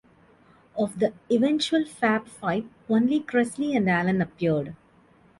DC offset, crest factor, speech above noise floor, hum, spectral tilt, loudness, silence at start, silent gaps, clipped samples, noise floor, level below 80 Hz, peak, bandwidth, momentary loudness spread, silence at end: under 0.1%; 16 dB; 33 dB; none; -6 dB/octave; -25 LUFS; 0.75 s; none; under 0.1%; -58 dBFS; -62 dBFS; -10 dBFS; 11.5 kHz; 7 LU; 0.65 s